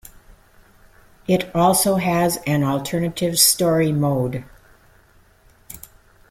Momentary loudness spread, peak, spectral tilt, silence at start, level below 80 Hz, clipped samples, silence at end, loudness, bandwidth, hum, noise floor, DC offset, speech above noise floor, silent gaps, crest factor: 21 LU; -2 dBFS; -4 dB/octave; 1.3 s; -50 dBFS; under 0.1%; 0.55 s; -18 LUFS; 16.5 kHz; none; -53 dBFS; under 0.1%; 35 dB; none; 20 dB